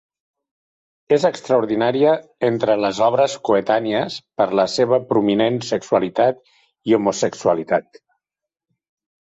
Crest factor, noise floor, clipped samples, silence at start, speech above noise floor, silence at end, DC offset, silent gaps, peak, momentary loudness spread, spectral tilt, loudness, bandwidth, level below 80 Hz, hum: 16 dB; -87 dBFS; under 0.1%; 1.1 s; 69 dB; 1.4 s; under 0.1%; none; -4 dBFS; 5 LU; -5 dB/octave; -19 LUFS; 8.2 kHz; -62 dBFS; none